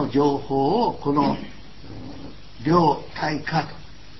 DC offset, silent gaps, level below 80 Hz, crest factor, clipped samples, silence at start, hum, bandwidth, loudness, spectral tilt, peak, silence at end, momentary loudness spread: 1%; none; -48 dBFS; 18 dB; under 0.1%; 0 s; none; 6 kHz; -22 LUFS; -7.5 dB/octave; -6 dBFS; 0 s; 22 LU